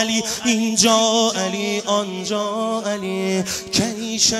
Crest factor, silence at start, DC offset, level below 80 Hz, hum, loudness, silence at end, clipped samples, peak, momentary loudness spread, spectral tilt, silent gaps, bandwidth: 18 dB; 0 s; under 0.1%; -54 dBFS; none; -19 LUFS; 0 s; under 0.1%; 0 dBFS; 8 LU; -2.5 dB/octave; none; 15.5 kHz